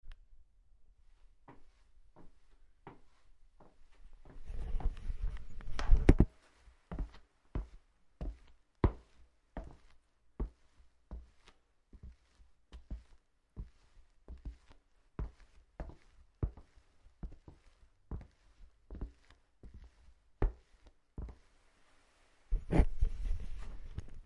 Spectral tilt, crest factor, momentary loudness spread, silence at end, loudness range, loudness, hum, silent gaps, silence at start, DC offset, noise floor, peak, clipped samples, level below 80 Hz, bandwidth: -8.5 dB/octave; 32 dB; 26 LU; 0.05 s; 19 LU; -40 LUFS; none; none; 0.05 s; under 0.1%; -67 dBFS; -6 dBFS; under 0.1%; -40 dBFS; 6.6 kHz